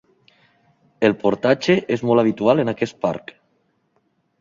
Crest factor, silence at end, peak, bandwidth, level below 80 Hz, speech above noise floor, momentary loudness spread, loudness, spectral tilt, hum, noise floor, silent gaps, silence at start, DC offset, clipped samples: 18 dB; 1.2 s; -2 dBFS; 7.6 kHz; -60 dBFS; 48 dB; 7 LU; -19 LUFS; -6.5 dB/octave; none; -66 dBFS; none; 1 s; under 0.1%; under 0.1%